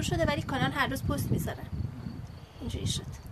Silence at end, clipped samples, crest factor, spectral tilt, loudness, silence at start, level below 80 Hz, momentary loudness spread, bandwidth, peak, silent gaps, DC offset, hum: 0 s; under 0.1%; 20 dB; -5 dB/octave; -32 LUFS; 0 s; -44 dBFS; 13 LU; 13.5 kHz; -12 dBFS; none; under 0.1%; none